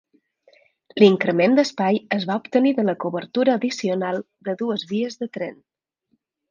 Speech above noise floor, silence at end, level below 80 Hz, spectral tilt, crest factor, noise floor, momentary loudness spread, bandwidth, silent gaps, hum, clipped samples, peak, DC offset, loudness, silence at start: 50 dB; 0.95 s; -70 dBFS; -6 dB/octave; 20 dB; -71 dBFS; 13 LU; 7.4 kHz; none; none; under 0.1%; -2 dBFS; under 0.1%; -21 LUFS; 0.95 s